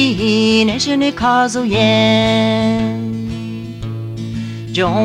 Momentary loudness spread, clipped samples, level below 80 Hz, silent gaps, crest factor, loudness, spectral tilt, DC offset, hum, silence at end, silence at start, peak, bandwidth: 13 LU; under 0.1%; -40 dBFS; none; 14 dB; -15 LUFS; -5 dB/octave; under 0.1%; none; 0 s; 0 s; -2 dBFS; 11 kHz